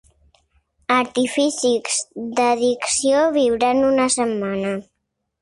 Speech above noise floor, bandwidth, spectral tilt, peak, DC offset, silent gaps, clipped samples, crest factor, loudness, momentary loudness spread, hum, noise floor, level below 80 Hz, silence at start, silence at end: 57 dB; 11.5 kHz; -3 dB/octave; -4 dBFS; under 0.1%; none; under 0.1%; 16 dB; -19 LUFS; 8 LU; none; -76 dBFS; -56 dBFS; 0.9 s; 0.6 s